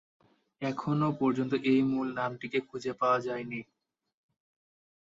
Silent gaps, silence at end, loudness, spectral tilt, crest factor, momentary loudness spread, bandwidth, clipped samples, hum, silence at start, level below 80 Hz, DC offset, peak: none; 1.5 s; -31 LUFS; -7.5 dB/octave; 18 dB; 11 LU; 7.8 kHz; under 0.1%; none; 0.6 s; -72 dBFS; under 0.1%; -14 dBFS